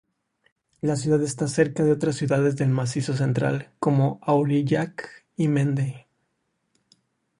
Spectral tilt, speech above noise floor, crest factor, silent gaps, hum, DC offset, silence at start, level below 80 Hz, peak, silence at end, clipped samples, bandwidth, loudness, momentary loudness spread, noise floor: -7 dB/octave; 52 dB; 18 dB; none; none; under 0.1%; 0.85 s; -60 dBFS; -6 dBFS; 1.4 s; under 0.1%; 11 kHz; -24 LUFS; 8 LU; -74 dBFS